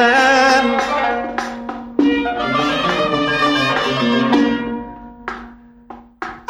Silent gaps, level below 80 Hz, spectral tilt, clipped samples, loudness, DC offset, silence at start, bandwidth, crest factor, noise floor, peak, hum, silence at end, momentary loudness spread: none; -46 dBFS; -4 dB/octave; under 0.1%; -16 LUFS; under 0.1%; 0 s; 13.5 kHz; 16 dB; -39 dBFS; 0 dBFS; none; 0.1 s; 18 LU